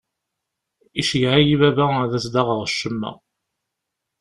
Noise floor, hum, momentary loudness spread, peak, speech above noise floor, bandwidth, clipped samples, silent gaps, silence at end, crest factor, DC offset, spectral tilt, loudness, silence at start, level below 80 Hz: -81 dBFS; none; 12 LU; -2 dBFS; 62 dB; 12 kHz; under 0.1%; none; 1.05 s; 20 dB; under 0.1%; -5.5 dB/octave; -19 LUFS; 0.95 s; -50 dBFS